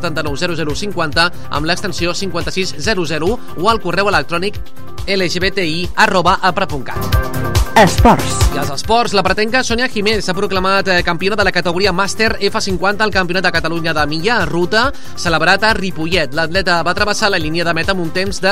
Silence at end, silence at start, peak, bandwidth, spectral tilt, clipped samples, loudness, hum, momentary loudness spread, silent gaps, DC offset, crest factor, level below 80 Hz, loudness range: 0 s; 0 s; 0 dBFS; 16 kHz; -4 dB/octave; under 0.1%; -15 LUFS; none; 8 LU; none; 9%; 16 dB; -28 dBFS; 4 LU